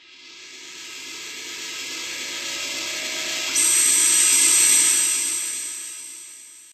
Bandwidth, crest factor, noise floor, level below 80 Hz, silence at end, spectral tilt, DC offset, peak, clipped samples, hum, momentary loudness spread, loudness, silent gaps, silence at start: 14 kHz; 18 dB; -44 dBFS; -70 dBFS; 0.1 s; 2.5 dB/octave; under 0.1%; -4 dBFS; under 0.1%; none; 22 LU; -18 LUFS; none; 0.1 s